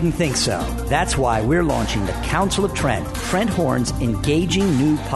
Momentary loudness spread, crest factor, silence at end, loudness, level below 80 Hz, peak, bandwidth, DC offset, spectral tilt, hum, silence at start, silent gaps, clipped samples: 4 LU; 14 dB; 0 s; -20 LUFS; -30 dBFS; -4 dBFS; 12.5 kHz; under 0.1%; -5 dB/octave; none; 0 s; none; under 0.1%